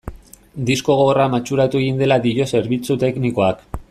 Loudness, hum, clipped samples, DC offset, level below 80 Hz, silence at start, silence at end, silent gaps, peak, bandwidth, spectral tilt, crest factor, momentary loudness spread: -18 LUFS; none; under 0.1%; under 0.1%; -42 dBFS; 0.05 s; 0.1 s; none; -2 dBFS; 13.5 kHz; -6 dB/octave; 14 dB; 9 LU